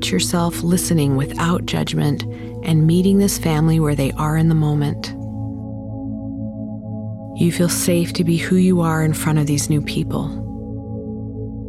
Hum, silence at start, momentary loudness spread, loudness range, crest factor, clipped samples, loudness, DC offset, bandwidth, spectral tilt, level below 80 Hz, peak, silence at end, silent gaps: none; 0 s; 13 LU; 5 LU; 14 dB; under 0.1%; -19 LUFS; under 0.1%; 15.5 kHz; -5.5 dB/octave; -38 dBFS; -4 dBFS; 0 s; none